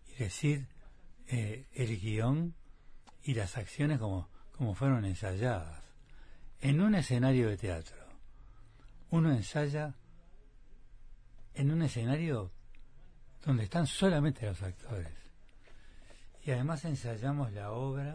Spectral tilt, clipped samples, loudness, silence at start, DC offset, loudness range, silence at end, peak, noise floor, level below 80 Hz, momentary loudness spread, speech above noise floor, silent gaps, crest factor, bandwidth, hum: -7 dB/octave; under 0.1%; -34 LUFS; 0.05 s; under 0.1%; 5 LU; 0 s; -18 dBFS; -55 dBFS; -52 dBFS; 13 LU; 22 dB; none; 16 dB; 10.5 kHz; none